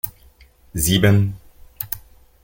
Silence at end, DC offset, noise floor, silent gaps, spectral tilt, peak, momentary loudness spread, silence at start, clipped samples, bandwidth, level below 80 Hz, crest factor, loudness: 0.45 s; under 0.1%; -50 dBFS; none; -5 dB/octave; -2 dBFS; 17 LU; 0.05 s; under 0.1%; 17 kHz; -40 dBFS; 20 dB; -19 LUFS